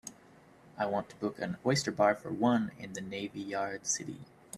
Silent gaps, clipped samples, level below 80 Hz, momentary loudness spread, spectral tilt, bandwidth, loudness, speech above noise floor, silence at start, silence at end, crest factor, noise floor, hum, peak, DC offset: none; under 0.1%; -70 dBFS; 12 LU; -4 dB/octave; 14 kHz; -33 LUFS; 26 dB; 0.05 s; 0 s; 22 dB; -59 dBFS; none; -12 dBFS; under 0.1%